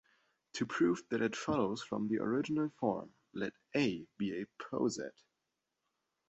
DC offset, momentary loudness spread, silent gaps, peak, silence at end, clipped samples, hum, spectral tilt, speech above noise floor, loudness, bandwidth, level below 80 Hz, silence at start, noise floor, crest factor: under 0.1%; 10 LU; none; -18 dBFS; 1.2 s; under 0.1%; none; -5 dB/octave; 51 dB; -36 LUFS; 8 kHz; -72 dBFS; 0.55 s; -87 dBFS; 18 dB